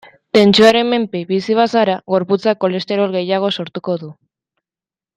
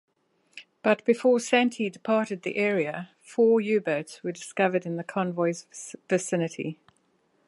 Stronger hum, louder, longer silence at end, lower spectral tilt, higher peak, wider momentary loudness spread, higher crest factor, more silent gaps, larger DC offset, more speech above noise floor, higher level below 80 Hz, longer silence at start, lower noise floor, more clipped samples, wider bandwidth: neither; first, -15 LUFS vs -26 LUFS; first, 1.05 s vs 0.75 s; about the same, -5.5 dB/octave vs -5 dB/octave; first, 0 dBFS vs -8 dBFS; about the same, 12 LU vs 13 LU; about the same, 16 dB vs 20 dB; neither; neither; first, over 75 dB vs 43 dB; first, -60 dBFS vs -80 dBFS; second, 0.35 s vs 0.55 s; first, under -90 dBFS vs -68 dBFS; neither; first, 13 kHz vs 11.5 kHz